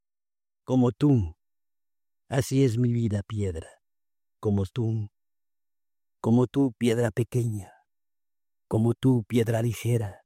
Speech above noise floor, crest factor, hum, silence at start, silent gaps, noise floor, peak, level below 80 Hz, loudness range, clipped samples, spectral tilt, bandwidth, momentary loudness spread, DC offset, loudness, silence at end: over 65 dB; 16 dB; none; 0.7 s; none; under -90 dBFS; -10 dBFS; -58 dBFS; 4 LU; under 0.1%; -7.5 dB/octave; 15.5 kHz; 9 LU; under 0.1%; -26 LUFS; 0.1 s